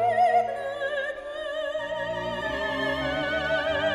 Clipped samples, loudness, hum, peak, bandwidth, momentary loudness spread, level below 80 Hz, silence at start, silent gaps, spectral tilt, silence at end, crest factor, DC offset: under 0.1%; -27 LUFS; none; -12 dBFS; 12.5 kHz; 9 LU; -50 dBFS; 0 s; none; -4.5 dB/octave; 0 s; 14 dB; under 0.1%